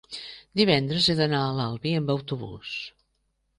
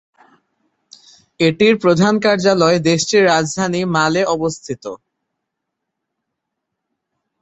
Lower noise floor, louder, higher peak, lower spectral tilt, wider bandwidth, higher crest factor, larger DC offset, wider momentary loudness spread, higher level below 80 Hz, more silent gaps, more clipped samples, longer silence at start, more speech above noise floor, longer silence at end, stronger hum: second, -73 dBFS vs -78 dBFS; second, -25 LUFS vs -15 LUFS; second, -6 dBFS vs -2 dBFS; first, -6 dB/octave vs -4.5 dB/octave; first, 10.5 kHz vs 8.4 kHz; about the same, 20 dB vs 16 dB; neither; first, 14 LU vs 11 LU; about the same, -58 dBFS vs -56 dBFS; neither; neither; second, 0.1 s vs 1.4 s; second, 48 dB vs 63 dB; second, 0.7 s vs 2.45 s; neither